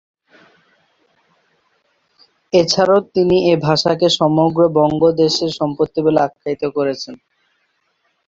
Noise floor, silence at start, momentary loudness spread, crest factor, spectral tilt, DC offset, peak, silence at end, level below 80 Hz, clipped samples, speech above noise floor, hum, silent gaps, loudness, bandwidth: -66 dBFS; 2.55 s; 7 LU; 16 dB; -5.5 dB/octave; under 0.1%; 0 dBFS; 1.1 s; -54 dBFS; under 0.1%; 51 dB; none; none; -15 LUFS; 7.8 kHz